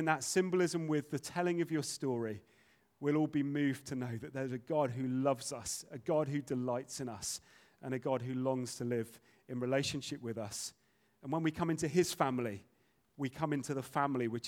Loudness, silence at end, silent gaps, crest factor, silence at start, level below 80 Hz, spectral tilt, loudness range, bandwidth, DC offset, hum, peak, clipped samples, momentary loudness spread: -36 LUFS; 0 s; none; 22 dB; 0 s; -72 dBFS; -5 dB/octave; 3 LU; 17.5 kHz; under 0.1%; none; -14 dBFS; under 0.1%; 10 LU